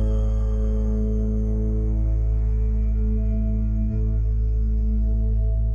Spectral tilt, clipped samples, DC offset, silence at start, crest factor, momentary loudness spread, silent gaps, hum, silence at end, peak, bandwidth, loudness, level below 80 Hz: -11 dB/octave; under 0.1%; under 0.1%; 0 s; 6 dB; 1 LU; none; none; 0 s; -14 dBFS; 1.6 kHz; -24 LUFS; -22 dBFS